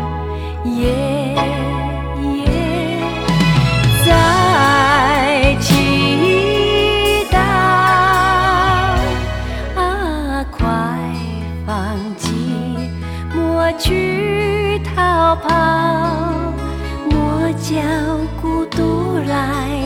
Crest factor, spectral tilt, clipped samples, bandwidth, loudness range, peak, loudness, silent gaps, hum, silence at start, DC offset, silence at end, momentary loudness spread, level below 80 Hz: 14 dB; -5.5 dB/octave; under 0.1%; 20 kHz; 8 LU; 0 dBFS; -16 LUFS; none; none; 0 s; 0.2%; 0 s; 11 LU; -26 dBFS